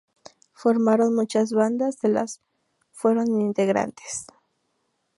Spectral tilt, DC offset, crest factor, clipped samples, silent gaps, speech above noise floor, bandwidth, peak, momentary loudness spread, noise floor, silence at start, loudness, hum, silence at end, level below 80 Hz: -5.5 dB/octave; under 0.1%; 18 dB; under 0.1%; none; 51 dB; 11.5 kHz; -6 dBFS; 13 LU; -73 dBFS; 0.6 s; -23 LUFS; none; 0.95 s; -70 dBFS